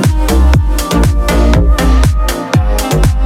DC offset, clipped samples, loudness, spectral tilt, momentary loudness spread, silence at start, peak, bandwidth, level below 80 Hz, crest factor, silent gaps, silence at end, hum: under 0.1%; under 0.1%; -11 LUFS; -6 dB/octave; 3 LU; 0 s; 0 dBFS; 16 kHz; -10 dBFS; 8 dB; none; 0 s; none